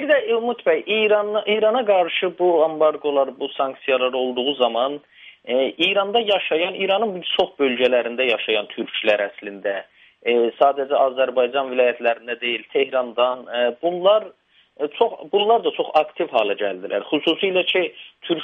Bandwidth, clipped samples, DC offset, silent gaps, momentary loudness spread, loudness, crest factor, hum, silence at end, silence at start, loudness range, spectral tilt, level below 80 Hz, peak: 6.2 kHz; under 0.1%; under 0.1%; none; 7 LU; -20 LUFS; 18 dB; none; 0 s; 0 s; 2 LU; -5.5 dB/octave; -72 dBFS; -2 dBFS